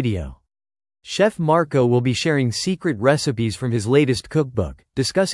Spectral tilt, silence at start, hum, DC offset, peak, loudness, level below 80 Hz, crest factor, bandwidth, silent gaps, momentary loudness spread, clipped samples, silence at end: -5.5 dB/octave; 0 s; none; under 0.1%; -4 dBFS; -20 LUFS; -46 dBFS; 16 dB; 12 kHz; none; 8 LU; under 0.1%; 0 s